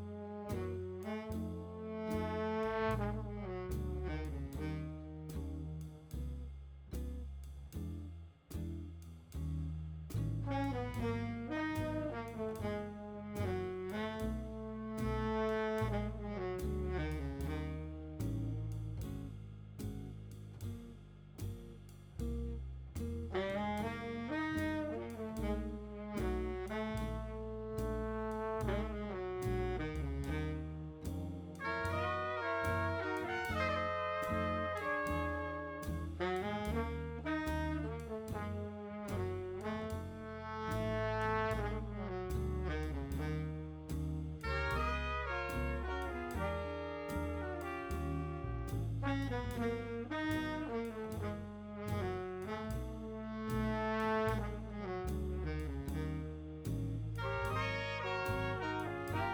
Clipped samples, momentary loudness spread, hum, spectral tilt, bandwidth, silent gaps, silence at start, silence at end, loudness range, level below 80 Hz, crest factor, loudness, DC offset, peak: under 0.1%; 10 LU; none; -7 dB/octave; over 20 kHz; none; 0 s; 0 s; 7 LU; -48 dBFS; 18 dB; -40 LUFS; under 0.1%; -22 dBFS